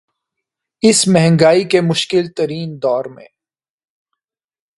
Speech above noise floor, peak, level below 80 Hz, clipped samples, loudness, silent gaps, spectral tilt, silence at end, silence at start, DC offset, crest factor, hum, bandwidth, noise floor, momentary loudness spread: 66 dB; 0 dBFS; -56 dBFS; under 0.1%; -14 LUFS; none; -4.5 dB/octave; 1.55 s; 0.85 s; under 0.1%; 16 dB; none; 11.5 kHz; -80 dBFS; 10 LU